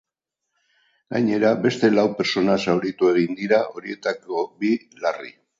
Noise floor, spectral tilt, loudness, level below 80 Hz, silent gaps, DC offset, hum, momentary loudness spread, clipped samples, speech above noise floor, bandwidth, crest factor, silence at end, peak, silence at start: -83 dBFS; -6 dB/octave; -22 LUFS; -64 dBFS; none; under 0.1%; none; 9 LU; under 0.1%; 62 dB; 7.8 kHz; 18 dB; 0.3 s; -4 dBFS; 1.1 s